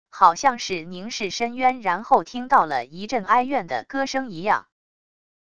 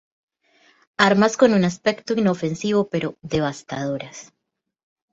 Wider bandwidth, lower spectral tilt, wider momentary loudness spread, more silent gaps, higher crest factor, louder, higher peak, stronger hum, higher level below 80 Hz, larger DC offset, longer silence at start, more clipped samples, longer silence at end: first, 10 kHz vs 7.8 kHz; second, -3.5 dB/octave vs -5.5 dB/octave; second, 10 LU vs 14 LU; neither; about the same, 22 dB vs 20 dB; about the same, -22 LUFS vs -21 LUFS; about the same, 0 dBFS vs -2 dBFS; neither; about the same, -60 dBFS vs -56 dBFS; first, 0.4% vs under 0.1%; second, 0.05 s vs 1 s; neither; second, 0.7 s vs 0.9 s